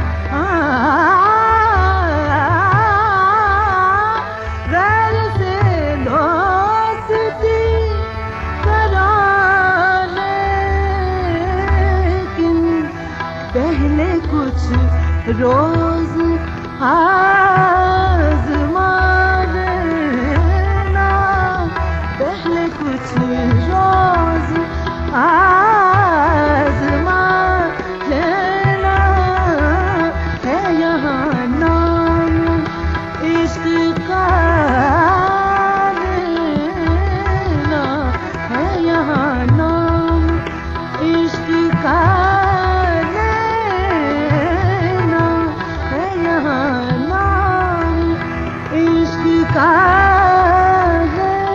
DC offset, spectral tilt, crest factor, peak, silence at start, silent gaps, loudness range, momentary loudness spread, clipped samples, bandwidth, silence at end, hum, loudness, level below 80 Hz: under 0.1%; -7.5 dB/octave; 14 dB; 0 dBFS; 0 s; none; 4 LU; 8 LU; under 0.1%; 7.4 kHz; 0 s; none; -15 LUFS; -24 dBFS